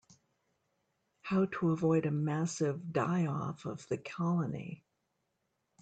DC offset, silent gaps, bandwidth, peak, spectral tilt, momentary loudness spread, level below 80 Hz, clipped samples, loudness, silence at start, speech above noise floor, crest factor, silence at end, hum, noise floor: under 0.1%; none; 9 kHz; -18 dBFS; -7 dB/octave; 13 LU; -74 dBFS; under 0.1%; -34 LUFS; 1.25 s; 49 dB; 16 dB; 1.05 s; none; -82 dBFS